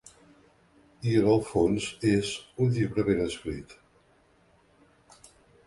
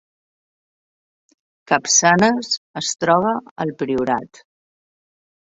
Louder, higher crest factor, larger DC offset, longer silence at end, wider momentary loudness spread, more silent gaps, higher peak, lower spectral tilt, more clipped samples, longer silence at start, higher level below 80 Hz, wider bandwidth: second, -27 LUFS vs -18 LUFS; about the same, 18 dB vs 20 dB; neither; first, 1.95 s vs 1.3 s; about the same, 11 LU vs 11 LU; second, none vs 2.58-2.74 s, 3.51-3.56 s; second, -10 dBFS vs -2 dBFS; first, -6.5 dB/octave vs -3 dB/octave; neither; second, 1 s vs 1.7 s; first, -52 dBFS vs -60 dBFS; first, 11.5 kHz vs 8 kHz